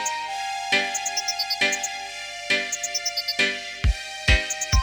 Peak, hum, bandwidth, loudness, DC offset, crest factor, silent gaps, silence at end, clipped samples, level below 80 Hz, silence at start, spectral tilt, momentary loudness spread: -6 dBFS; 50 Hz at -55 dBFS; over 20 kHz; -24 LUFS; under 0.1%; 20 dB; none; 0 s; under 0.1%; -32 dBFS; 0 s; -2 dB/octave; 7 LU